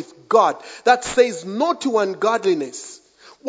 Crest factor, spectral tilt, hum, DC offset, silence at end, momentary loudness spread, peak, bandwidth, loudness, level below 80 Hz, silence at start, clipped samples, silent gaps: 20 dB; -3.5 dB/octave; none; under 0.1%; 0 s; 8 LU; 0 dBFS; 8 kHz; -19 LUFS; -60 dBFS; 0 s; under 0.1%; none